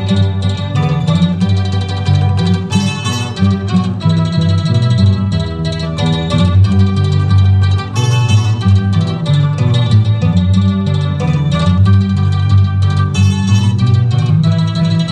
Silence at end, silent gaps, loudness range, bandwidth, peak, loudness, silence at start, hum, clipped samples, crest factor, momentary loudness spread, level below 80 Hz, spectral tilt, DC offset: 0 s; none; 2 LU; 9.4 kHz; 0 dBFS; -13 LUFS; 0 s; none; under 0.1%; 10 dB; 4 LU; -34 dBFS; -7 dB/octave; under 0.1%